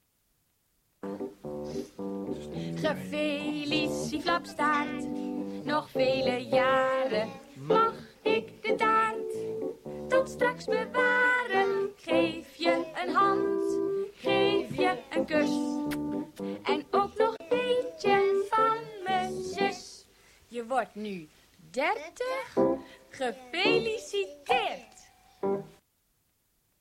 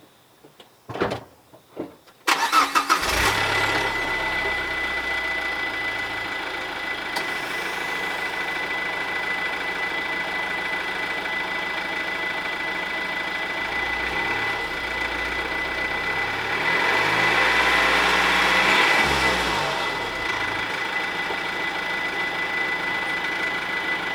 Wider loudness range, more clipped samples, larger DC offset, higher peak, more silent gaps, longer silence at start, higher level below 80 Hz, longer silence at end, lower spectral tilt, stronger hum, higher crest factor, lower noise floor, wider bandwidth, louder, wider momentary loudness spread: about the same, 6 LU vs 7 LU; neither; neither; second, -12 dBFS vs -4 dBFS; neither; first, 1.05 s vs 0.45 s; second, -64 dBFS vs -46 dBFS; first, 1.1 s vs 0 s; first, -4.5 dB/octave vs -2.5 dB/octave; neither; about the same, 18 dB vs 20 dB; first, -73 dBFS vs -53 dBFS; second, 16 kHz vs over 20 kHz; second, -29 LUFS vs -22 LUFS; first, 12 LU vs 8 LU